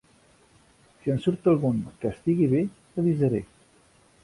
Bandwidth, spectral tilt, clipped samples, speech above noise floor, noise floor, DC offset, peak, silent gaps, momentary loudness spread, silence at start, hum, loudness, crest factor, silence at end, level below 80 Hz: 11.5 kHz; -9.5 dB/octave; under 0.1%; 35 dB; -59 dBFS; under 0.1%; -10 dBFS; none; 9 LU; 1.05 s; none; -26 LUFS; 16 dB; 0.8 s; -56 dBFS